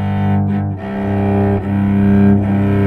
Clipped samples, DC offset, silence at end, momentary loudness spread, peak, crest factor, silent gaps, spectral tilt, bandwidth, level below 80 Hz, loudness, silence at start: under 0.1%; under 0.1%; 0 s; 8 LU; -2 dBFS; 12 dB; none; -10.5 dB/octave; 4 kHz; -36 dBFS; -15 LUFS; 0 s